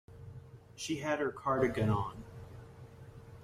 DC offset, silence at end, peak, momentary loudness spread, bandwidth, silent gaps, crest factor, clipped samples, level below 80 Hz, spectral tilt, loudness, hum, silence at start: under 0.1%; 0 s; -18 dBFS; 22 LU; 14.5 kHz; none; 20 dB; under 0.1%; -58 dBFS; -6 dB/octave; -34 LUFS; none; 0.1 s